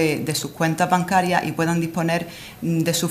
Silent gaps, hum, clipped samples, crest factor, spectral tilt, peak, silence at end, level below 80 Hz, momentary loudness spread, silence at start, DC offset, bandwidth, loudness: none; none; under 0.1%; 18 dB; -5 dB/octave; -2 dBFS; 0 s; -56 dBFS; 6 LU; 0 s; under 0.1%; 16 kHz; -21 LUFS